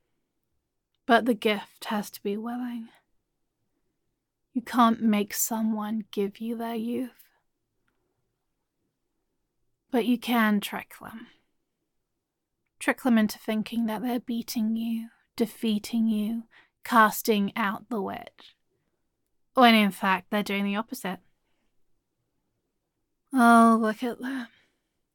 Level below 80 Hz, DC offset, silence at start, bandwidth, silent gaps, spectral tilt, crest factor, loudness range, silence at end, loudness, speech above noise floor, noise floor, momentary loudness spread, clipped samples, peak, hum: -72 dBFS; under 0.1%; 1.1 s; 17.5 kHz; none; -4.5 dB/octave; 22 dB; 9 LU; 0.7 s; -26 LUFS; 56 dB; -82 dBFS; 15 LU; under 0.1%; -6 dBFS; none